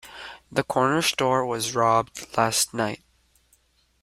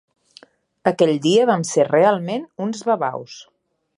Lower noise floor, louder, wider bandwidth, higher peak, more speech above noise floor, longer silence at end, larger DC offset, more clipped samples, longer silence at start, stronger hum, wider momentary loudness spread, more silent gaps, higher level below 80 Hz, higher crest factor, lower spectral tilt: first, -64 dBFS vs -50 dBFS; second, -23 LUFS vs -19 LUFS; first, 16 kHz vs 11.5 kHz; second, -6 dBFS vs -2 dBFS; first, 40 dB vs 32 dB; first, 1.05 s vs 0.55 s; neither; neither; second, 0.05 s vs 0.85 s; neither; second, 10 LU vs 13 LU; neither; first, -60 dBFS vs -72 dBFS; about the same, 20 dB vs 18 dB; second, -3 dB/octave vs -5 dB/octave